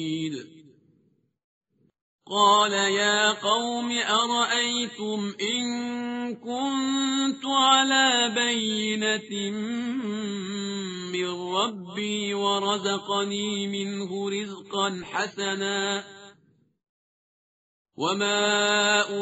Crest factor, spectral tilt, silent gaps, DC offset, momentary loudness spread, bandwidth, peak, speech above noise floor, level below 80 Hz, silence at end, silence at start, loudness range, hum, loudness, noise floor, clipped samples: 20 dB; -1 dB/octave; 1.44-1.61 s, 2.01-2.19 s, 16.89-17.85 s; under 0.1%; 11 LU; 8 kHz; -6 dBFS; 41 dB; -72 dBFS; 0 s; 0 s; 7 LU; none; -25 LUFS; -67 dBFS; under 0.1%